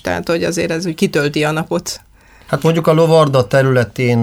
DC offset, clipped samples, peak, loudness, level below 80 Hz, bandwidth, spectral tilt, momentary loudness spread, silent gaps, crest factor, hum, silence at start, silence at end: under 0.1%; under 0.1%; 0 dBFS; -15 LUFS; -46 dBFS; 16.5 kHz; -6 dB/octave; 10 LU; none; 14 dB; none; 0.05 s; 0 s